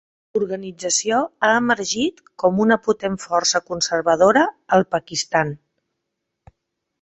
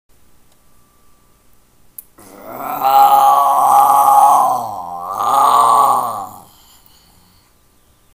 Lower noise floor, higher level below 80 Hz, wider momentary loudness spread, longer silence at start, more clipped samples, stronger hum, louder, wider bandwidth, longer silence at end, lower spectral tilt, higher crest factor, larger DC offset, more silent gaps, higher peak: first, -79 dBFS vs -53 dBFS; about the same, -58 dBFS vs -58 dBFS; second, 9 LU vs 17 LU; second, 0.35 s vs 2.45 s; neither; neither; second, -19 LUFS vs -11 LUFS; second, 8.4 kHz vs 16 kHz; second, 1.45 s vs 1.75 s; about the same, -3 dB/octave vs -2.5 dB/octave; about the same, 18 dB vs 14 dB; second, under 0.1% vs 0.1%; neither; about the same, -2 dBFS vs 0 dBFS